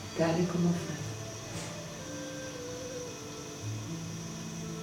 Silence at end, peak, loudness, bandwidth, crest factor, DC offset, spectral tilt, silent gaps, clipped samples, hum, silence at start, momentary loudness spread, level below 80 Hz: 0 s; -16 dBFS; -36 LUFS; 17 kHz; 20 dB; under 0.1%; -5 dB/octave; none; under 0.1%; none; 0 s; 11 LU; -60 dBFS